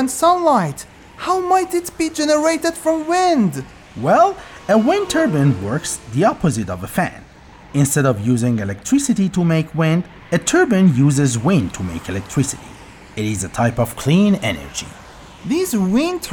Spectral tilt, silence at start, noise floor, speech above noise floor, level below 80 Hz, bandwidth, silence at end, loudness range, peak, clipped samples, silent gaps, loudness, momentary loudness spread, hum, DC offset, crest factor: -5.5 dB/octave; 0 s; -42 dBFS; 25 dB; -46 dBFS; over 20 kHz; 0 s; 3 LU; -2 dBFS; under 0.1%; none; -17 LUFS; 11 LU; none; under 0.1%; 14 dB